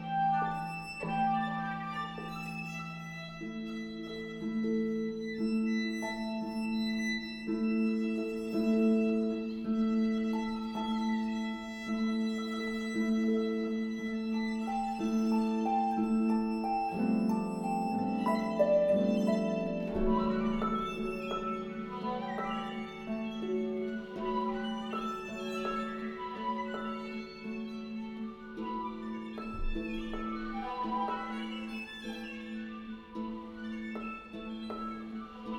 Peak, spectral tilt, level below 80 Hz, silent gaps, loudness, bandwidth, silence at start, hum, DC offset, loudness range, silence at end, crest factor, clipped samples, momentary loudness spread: -16 dBFS; -6.5 dB/octave; -52 dBFS; none; -34 LUFS; 11.5 kHz; 0 s; none; under 0.1%; 9 LU; 0 s; 18 dB; under 0.1%; 11 LU